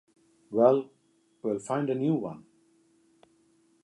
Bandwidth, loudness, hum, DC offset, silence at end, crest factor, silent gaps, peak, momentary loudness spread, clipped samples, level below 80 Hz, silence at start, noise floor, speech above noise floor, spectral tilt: 11.5 kHz; -28 LUFS; none; under 0.1%; 1.45 s; 22 dB; none; -8 dBFS; 18 LU; under 0.1%; -78 dBFS; 0.5 s; -68 dBFS; 42 dB; -8 dB/octave